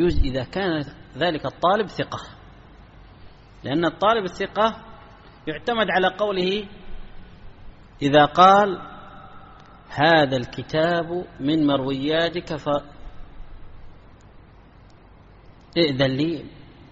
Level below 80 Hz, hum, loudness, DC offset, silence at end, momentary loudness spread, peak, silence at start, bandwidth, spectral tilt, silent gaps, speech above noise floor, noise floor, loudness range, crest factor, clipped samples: -40 dBFS; none; -21 LUFS; under 0.1%; 0.25 s; 18 LU; -2 dBFS; 0 s; 8 kHz; -3.5 dB/octave; none; 28 dB; -48 dBFS; 9 LU; 22 dB; under 0.1%